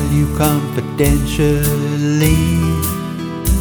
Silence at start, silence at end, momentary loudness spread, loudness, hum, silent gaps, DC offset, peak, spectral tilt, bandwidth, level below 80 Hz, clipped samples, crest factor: 0 s; 0 s; 7 LU; -16 LUFS; none; none; under 0.1%; 0 dBFS; -6 dB/octave; over 20 kHz; -24 dBFS; under 0.1%; 14 dB